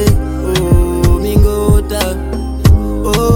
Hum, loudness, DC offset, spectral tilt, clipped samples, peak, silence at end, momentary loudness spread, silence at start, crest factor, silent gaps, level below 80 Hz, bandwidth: none; -13 LUFS; under 0.1%; -6.5 dB/octave; under 0.1%; 0 dBFS; 0 s; 5 LU; 0 s; 10 dB; none; -14 dBFS; 18 kHz